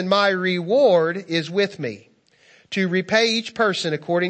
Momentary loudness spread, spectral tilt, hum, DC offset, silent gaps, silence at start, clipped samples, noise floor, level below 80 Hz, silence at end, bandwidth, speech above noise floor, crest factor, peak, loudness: 10 LU; -4.5 dB/octave; none; under 0.1%; none; 0 s; under 0.1%; -55 dBFS; -70 dBFS; 0 s; 8.6 kHz; 35 dB; 18 dB; -2 dBFS; -20 LUFS